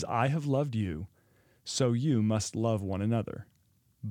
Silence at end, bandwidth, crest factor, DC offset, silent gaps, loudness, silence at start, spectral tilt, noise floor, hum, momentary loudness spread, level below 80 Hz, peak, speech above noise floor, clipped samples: 0 s; 13.5 kHz; 18 dB; under 0.1%; none; -30 LUFS; 0 s; -6 dB/octave; -69 dBFS; none; 16 LU; -62 dBFS; -12 dBFS; 39 dB; under 0.1%